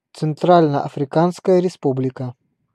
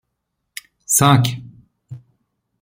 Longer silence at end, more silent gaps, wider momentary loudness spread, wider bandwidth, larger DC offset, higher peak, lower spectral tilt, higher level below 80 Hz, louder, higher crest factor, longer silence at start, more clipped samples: second, 0.4 s vs 0.65 s; neither; second, 11 LU vs 24 LU; second, 11.5 kHz vs 16.5 kHz; neither; about the same, 0 dBFS vs -2 dBFS; first, -8 dB/octave vs -4 dB/octave; second, -66 dBFS vs -54 dBFS; second, -18 LUFS vs -15 LUFS; about the same, 18 dB vs 20 dB; second, 0.15 s vs 0.9 s; neither